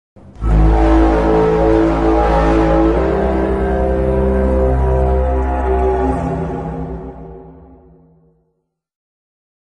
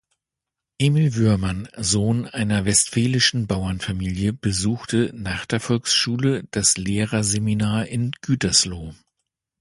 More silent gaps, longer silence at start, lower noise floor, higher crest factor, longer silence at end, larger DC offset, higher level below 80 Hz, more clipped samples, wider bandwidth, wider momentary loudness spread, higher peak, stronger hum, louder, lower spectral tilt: neither; second, 0.35 s vs 0.8 s; second, -68 dBFS vs -86 dBFS; second, 12 dB vs 18 dB; first, 2.05 s vs 0.65 s; neither; first, -20 dBFS vs -42 dBFS; neither; second, 7 kHz vs 11.5 kHz; first, 12 LU vs 8 LU; about the same, -2 dBFS vs -4 dBFS; neither; first, -15 LUFS vs -21 LUFS; first, -9 dB/octave vs -4 dB/octave